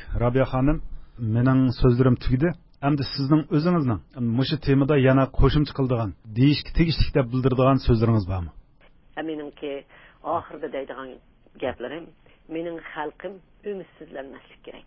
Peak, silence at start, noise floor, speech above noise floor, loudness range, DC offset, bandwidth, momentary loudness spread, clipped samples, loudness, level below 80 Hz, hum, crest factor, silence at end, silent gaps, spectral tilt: -4 dBFS; 0 s; -54 dBFS; 31 dB; 13 LU; under 0.1%; 5.8 kHz; 18 LU; under 0.1%; -23 LUFS; -36 dBFS; none; 18 dB; 0.05 s; none; -12 dB/octave